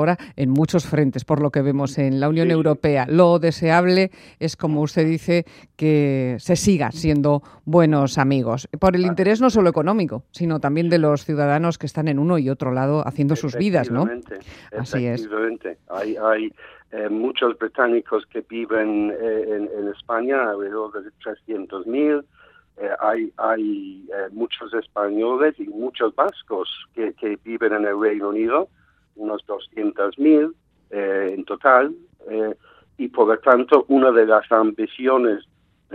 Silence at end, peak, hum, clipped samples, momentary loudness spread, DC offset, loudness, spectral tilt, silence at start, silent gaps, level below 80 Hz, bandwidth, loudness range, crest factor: 0 s; 0 dBFS; none; under 0.1%; 13 LU; under 0.1%; -20 LUFS; -7 dB/octave; 0 s; none; -52 dBFS; 14 kHz; 6 LU; 20 dB